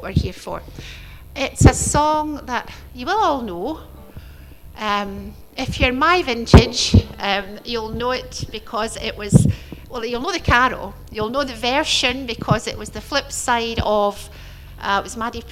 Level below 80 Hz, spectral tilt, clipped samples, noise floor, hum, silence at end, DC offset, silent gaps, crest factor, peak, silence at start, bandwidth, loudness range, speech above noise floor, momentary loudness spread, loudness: -30 dBFS; -4.5 dB/octave; under 0.1%; -39 dBFS; none; 0 s; under 0.1%; none; 20 dB; 0 dBFS; 0 s; 15.5 kHz; 5 LU; 20 dB; 17 LU; -19 LUFS